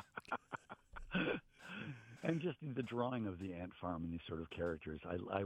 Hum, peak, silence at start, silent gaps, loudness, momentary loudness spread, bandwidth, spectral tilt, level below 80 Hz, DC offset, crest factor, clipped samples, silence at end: none; -20 dBFS; 0 s; none; -44 LUFS; 11 LU; 11 kHz; -7.5 dB/octave; -64 dBFS; under 0.1%; 22 dB; under 0.1%; 0 s